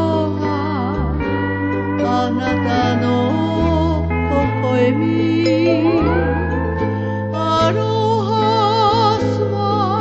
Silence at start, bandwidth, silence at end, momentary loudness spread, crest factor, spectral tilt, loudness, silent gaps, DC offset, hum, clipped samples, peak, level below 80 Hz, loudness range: 0 s; 8 kHz; 0 s; 5 LU; 14 dB; -7.5 dB/octave; -17 LUFS; none; under 0.1%; none; under 0.1%; -4 dBFS; -30 dBFS; 2 LU